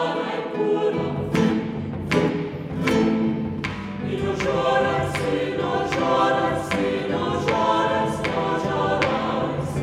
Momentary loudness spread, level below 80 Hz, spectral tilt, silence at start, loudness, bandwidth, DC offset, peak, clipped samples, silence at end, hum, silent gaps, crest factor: 7 LU; -48 dBFS; -6 dB/octave; 0 s; -23 LUFS; 15.5 kHz; under 0.1%; -4 dBFS; under 0.1%; 0 s; none; none; 18 dB